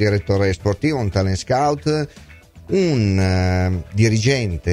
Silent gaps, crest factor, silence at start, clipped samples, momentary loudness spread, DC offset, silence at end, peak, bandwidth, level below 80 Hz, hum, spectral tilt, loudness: none; 16 dB; 0 s; under 0.1%; 5 LU; under 0.1%; 0 s; -2 dBFS; 11.5 kHz; -38 dBFS; none; -6.5 dB/octave; -19 LUFS